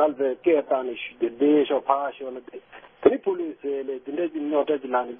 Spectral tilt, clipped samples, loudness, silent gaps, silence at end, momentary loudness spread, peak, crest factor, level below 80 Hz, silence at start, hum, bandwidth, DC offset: -9.5 dB/octave; under 0.1%; -24 LUFS; none; 0 s; 13 LU; -4 dBFS; 22 dB; -66 dBFS; 0 s; none; 3.7 kHz; under 0.1%